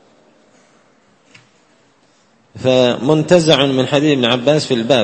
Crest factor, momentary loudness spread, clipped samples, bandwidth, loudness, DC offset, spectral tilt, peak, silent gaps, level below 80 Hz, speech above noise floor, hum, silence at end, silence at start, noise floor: 16 dB; 5 LU; under 0.1%; 11 kHz; -13 LUFS; under 0.1%; -5 dB/octave; 0 dBFS; none; -56 dBFS; 41 dB; none; 0 s; 2.55 s; -54 dBFS